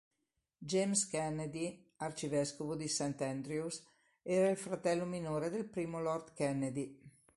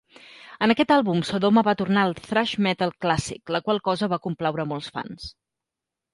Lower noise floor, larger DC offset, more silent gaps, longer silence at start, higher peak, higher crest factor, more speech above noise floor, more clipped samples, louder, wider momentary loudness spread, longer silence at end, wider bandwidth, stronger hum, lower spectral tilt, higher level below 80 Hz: about the same, -86 dBFS vs -87 dBFS; neither; neither; first, 0.6 s vs 0.4 s; second, -20 dBFS vs -4 dBFS; about the same, 18 dB vs 20 dB; second, 49 dB vs 64 dB; neither; second, -37 LUFS vs -23 LUFS; second, 11 LU vs 14 LU; second, 0.3 s vs 0.85 s; about the same, 11.5 kHz vs 11.5 kHz; neither; about the same, -4.5 dB/octave vs -5.5 dB/octave; second, -72 dBFS vs -56 dBFS